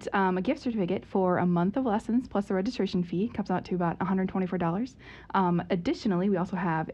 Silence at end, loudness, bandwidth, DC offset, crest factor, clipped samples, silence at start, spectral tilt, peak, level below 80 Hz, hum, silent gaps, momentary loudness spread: 0 s; -29 LUFS; 8.4 kHz; under 0.1%; 16 dB; under 0.1%; 0 s; -8 dB/octave; -12 dBFS; -56 dBFS; none; none; 4 LU